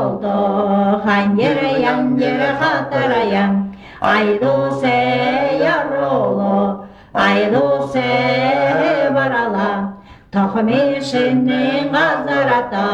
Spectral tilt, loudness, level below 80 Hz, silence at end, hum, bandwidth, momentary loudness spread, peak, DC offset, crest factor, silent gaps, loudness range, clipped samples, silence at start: -6.5 dB/octave; -16 LUFS; -50 dBFS; 0 s; none; 9.4 kHz; 4 LU; -2 dBFS; under 0.1%; 14 dB; none; 1 LU; under 0.1%; 0 s